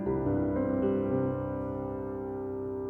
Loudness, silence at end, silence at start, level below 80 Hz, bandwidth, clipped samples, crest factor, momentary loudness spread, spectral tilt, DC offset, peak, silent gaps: -32 LUFS; 0 s; 0 s; -50 dBFS; 3.4 kHz; under 0.1%; 14 dB; 7 LU; -11.5 dB/octave; under 0.1%; -16 dBFS; none